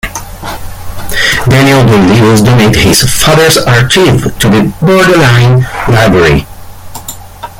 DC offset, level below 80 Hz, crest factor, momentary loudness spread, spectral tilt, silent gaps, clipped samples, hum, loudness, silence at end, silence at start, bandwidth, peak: under 0.1%; -24 dBFS; 6 dB; 18 LU; -5 dB/octave; none; 0.4%; none; -6 LUFS; 0 s; 0.05 s; 17 kHz; 0 dBFS